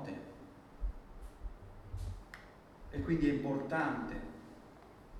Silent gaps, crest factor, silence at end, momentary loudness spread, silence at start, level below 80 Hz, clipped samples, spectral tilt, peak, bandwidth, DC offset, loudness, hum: none; 20 dB; 0 s; 23 LU; 0 s; -48 dBFS; under 0.1%; -7.5 dB/octave; -20 dBFS; 12.5 kHz; under 0.1%; -38 LUFS; none